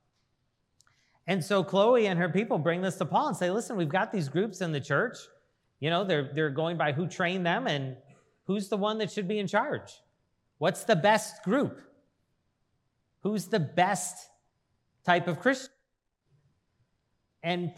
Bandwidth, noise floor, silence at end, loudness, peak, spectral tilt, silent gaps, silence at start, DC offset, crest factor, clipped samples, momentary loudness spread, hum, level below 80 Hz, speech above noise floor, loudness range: 15.5 kHz; -79 dBFS; 0.05 s; -29 LUFS; -8 dBFS; -5 dB/octave; none; 1.25 s; under 0.1%; 22 dB; under 0.1%; 10 LU; none; -80 dBFS; 51 dB; 5 LU